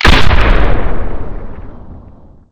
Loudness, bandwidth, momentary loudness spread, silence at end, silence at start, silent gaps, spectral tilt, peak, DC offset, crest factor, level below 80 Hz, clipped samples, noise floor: -14 LUFS; 10.5 kHz; 24 LU; 0 s; 0 s; none; -5.5 dB/octave; 0 dBFS; under 0.1%; 10 dB; -14 dBFS; 5%; -37 dBFS